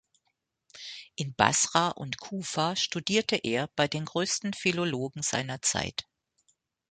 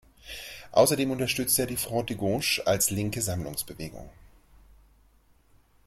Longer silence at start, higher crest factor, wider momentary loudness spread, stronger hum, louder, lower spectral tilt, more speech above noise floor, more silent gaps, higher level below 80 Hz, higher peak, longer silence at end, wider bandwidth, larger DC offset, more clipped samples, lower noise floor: first, 0.75 s vs 0.25 s; about the same, 26 dB vs 22 dB; second, 12 LU vs 17 LU; neither; about the same, -28 LUFS vs -26 LUFS; about the same, -3 dB/octave vs -3.5 dB/octave; first, 50 dB vs 34 dB; neither; second, -62 dBFS vs -54 dBFS; first, -4 dBFS vs -8 dBFS; second, 0.9 s vs 1.75 s; second, 9.6 kHz vs 16.5 kHz; neither; neither; first, -79 dBFS vs -61 dBFS